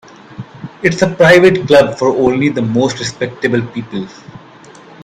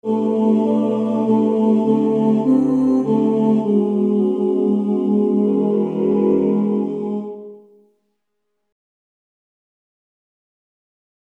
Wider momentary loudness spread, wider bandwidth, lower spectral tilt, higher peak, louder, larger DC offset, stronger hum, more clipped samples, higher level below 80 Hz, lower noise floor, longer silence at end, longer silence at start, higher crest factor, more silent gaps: first, 22 LU vs 4 LU; first, 13 kHz vs 3.6 kHz; second, -5.5 dB/octave vs -10 dB/octave; first, 0 dBFS vs -4 dBFS; first, -12 LUFS vs -17 LUFS; neither; neither; first, 0.2% vs under 0.1%; first, -46 dBFS vs -60 dBFS; second, -38 dBFS vs -76 dBFS; second, 0.65 s vs 3.65 s; first, 0.3 s vs 0.05 s; about the same, 14 dB vs 14 dB; neither